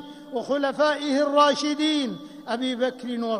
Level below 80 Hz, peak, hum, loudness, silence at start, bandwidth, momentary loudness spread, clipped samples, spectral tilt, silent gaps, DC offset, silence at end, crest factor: -72 dBFS; -8 dBFS; none; -24 LUFS; 0 s; 11 kHz; 13 LU; under 0.1%; -3.5 dB/octave; none; under 0.1%; 0 s; 18 dB